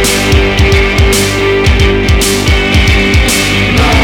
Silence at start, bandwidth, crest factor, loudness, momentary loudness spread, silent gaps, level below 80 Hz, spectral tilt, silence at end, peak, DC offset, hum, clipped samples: 0 s; 18.5 kHz; 8 dB; -8 LUFS; 1 LU; none; -14 dBFS; -4 dB/octave; 0 s; 0 dBFS; under 0.1%; none; under 0.1%